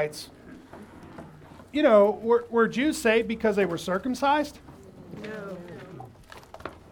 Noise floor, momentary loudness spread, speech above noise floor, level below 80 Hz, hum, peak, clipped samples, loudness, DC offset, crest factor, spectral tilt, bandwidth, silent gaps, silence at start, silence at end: -48 dBFS; 25 LU; 24 dB; -58 dBFS; none; -8 dBFS; under 0.1%; -24 LUFS; under 0.1%; 20 dB; -5 dB/octave; 19 kHz; none; 0 s; 0.15 s